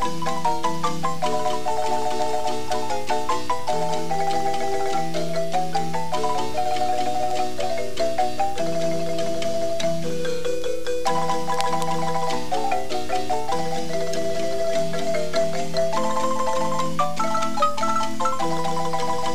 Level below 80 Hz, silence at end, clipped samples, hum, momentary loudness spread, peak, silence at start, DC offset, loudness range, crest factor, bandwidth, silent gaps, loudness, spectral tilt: -52 dBFS; 0 s; under 0.1%; none; 3 LU; -4 dBFS; 0 s; 8%; 2 LU; 22 dB; 15.5 kHz; none; -25 LUFS; -4 dB/octave